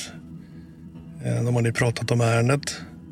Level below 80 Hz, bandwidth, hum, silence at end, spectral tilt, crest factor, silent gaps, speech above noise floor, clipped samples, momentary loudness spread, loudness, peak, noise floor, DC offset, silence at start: -54 dBFS; 14.5 kHz; none; 0 s; -5.5 dB/octave; 18 dB; none; 20 dB; under 0.1%; 22 LU; -23 LUFS; -6 dBFS; -43 dBFS; under 0.1%; 0 s